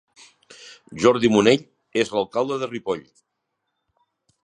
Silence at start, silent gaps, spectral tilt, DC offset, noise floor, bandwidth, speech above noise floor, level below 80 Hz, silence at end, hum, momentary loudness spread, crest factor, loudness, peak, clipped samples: 0.6 s; none; -5 dB/octave; under 0.1%; -78 dBFS; 11 kHz; 58 dB; -60 dBFS; 1.45 s; none; 19 LU; 22 dB; -21 LUFS; -2 dBFS; under 0.1%